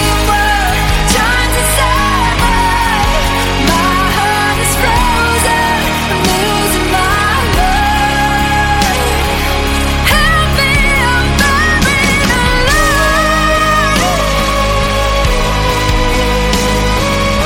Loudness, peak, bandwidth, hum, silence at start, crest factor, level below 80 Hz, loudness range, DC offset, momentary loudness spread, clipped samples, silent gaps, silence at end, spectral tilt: -11 LUFS; 0 dBFS; 17 kHz; none; 0 s; 10 dB; -18 dBFS; 2 LU; under 0.1%; 3 LU; under 0.1%; none; 0 s; -3.5 dB/octave